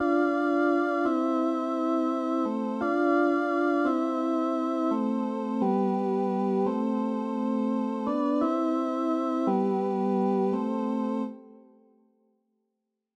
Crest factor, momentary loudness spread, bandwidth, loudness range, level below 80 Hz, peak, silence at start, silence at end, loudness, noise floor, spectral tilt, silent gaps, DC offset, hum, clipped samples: 14 dB; 4 LU; 8.8 kHz; 2 LU; -74 dBFS; -12 dBFS; 0 s; 1.6 s; -27 LUFS; -82 dBFS; -8 dB/octave; none; under 0.1%; none; under 0.1%